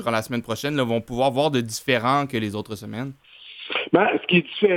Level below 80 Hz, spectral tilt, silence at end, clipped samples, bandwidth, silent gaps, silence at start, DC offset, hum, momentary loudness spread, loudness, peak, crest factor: -58 dBFS; -5 dB/octave; 0 s; under 0.1%; 18 kHz; none; 0 s; under 0.1%; none; 13 LU; -23 LUFS; -4 dBFS; 20 dB